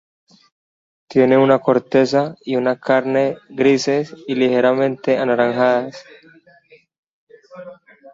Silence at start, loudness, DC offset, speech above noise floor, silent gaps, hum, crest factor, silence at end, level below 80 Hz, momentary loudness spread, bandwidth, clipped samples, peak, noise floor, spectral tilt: 1.1 s; -17 LUFS; under 0.1%; 35 dB; 6.98-7.03 s, 7.09-7.27 s; none; 16 dB; 0.4 s; -64 dBFS; 8 LU; 7.8 kHz; under 0.1%; -2 dBFS; -51 dBFS; -6 dB/octave